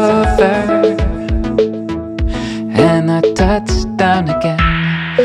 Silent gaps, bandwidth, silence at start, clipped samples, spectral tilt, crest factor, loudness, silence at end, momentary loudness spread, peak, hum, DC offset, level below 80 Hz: none; 11 kHz; 0 s; under 0.1%; -6.5 dB/octave; 14 dB; -14 LUFS; 0 s; 8 LU; 0 dBFS; none; under 0.1%; -22 dBFS